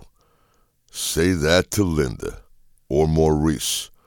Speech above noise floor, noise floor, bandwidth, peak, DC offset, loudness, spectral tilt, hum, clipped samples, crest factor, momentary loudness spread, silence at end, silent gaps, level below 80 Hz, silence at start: 42 dB; -62 dBFS; 18.5 kHz; -4 dBFS; under 0.1%; -20 LUFS; -4.5 dB/octave; none; under 0.1%; 18 dB; 11 LU; 0.2 s; none; -36 dBFS; 0.95 s